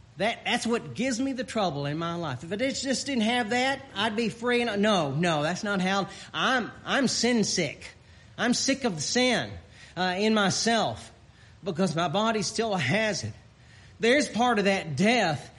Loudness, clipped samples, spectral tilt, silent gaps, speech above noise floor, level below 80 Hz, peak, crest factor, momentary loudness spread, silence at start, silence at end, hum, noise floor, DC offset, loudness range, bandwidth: -26 LUFS; under 0.1%; -4 dB/octave; none; 26 dB; -60 dBFS; -12 dBFS; 16 dB; 9 LU; 0.15 s; 0.1 s; none; -52 dBFS; under 0.1%; 2 LU; 11.5 kHz